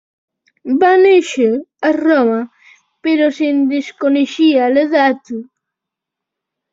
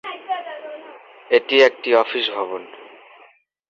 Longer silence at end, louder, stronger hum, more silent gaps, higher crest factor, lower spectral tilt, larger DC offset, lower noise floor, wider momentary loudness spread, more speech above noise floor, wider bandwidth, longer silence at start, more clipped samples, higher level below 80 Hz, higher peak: first, 1.3 s vs 0.85 s; first, -14 LUFS vs -18 LUFS; neither; neither; second, 14 dB vs 20 dB; first, -4.5 dB/octave vs -2.5 dB/octave; neither; first, -82 dBFS vs -53 dBFS; second, 13 LU vs 21 LU; first, 69 dB vs 35 dB; about the same, 7.8 kHz vs 7.4 kHz; first, 0.65 s vs 0.05 s; neither; first, -64 dBFS vs -70 dBFS; about the same, -2 dBFS vs -2 dBFS